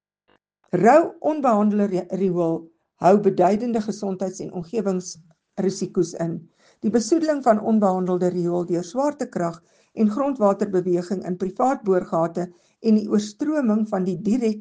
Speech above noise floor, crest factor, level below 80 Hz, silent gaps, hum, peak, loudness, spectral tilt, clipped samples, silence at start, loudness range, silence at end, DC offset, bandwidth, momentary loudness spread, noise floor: 44 dB; 18 dB; -64 dBFS; none; none; -2 dBFS; -22 LUFS; -7 dB/octave; under 0.1%; 0.75 s; 4 LU; 0 s; under 0.1%; 9.4 kHz; 10 LU; -65 dBFS